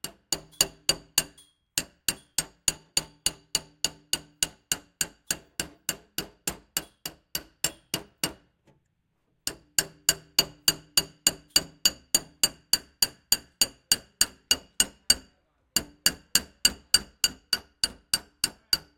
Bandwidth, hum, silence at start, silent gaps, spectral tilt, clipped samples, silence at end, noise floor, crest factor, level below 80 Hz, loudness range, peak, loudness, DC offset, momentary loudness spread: 17 kHz; none; 0.05 s; none; 0.5 dB/octave; under 0.1%; 0.2 s; -74 dBFS; 28 dB; -54 dBFS; 8 LU; -2 dBFS; -27 LUFS; under 0.1%; 10 LU